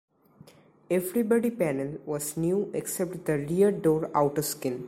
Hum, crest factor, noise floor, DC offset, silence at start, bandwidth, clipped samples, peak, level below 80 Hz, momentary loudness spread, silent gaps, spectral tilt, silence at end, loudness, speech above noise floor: none; 18 dB; -55 dBFS; under 0.1%; 0.9 s; 16 kHz; under 0.1%; -10 dBFS; -62 dBFS; 7 LU; none; -6 dB/octave; 0 s; -27 LUFS; 28 dB